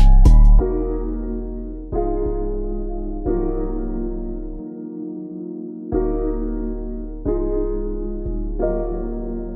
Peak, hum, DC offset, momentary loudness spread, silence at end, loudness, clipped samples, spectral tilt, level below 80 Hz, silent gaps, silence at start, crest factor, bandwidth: -4 dBFS; none; under 0.1%; 13 LU; 0 s; -24 LUFS; under 0.1%; -10 dB/octave; -20 dBFS; none; 0 s; 14 dB; 2 kHz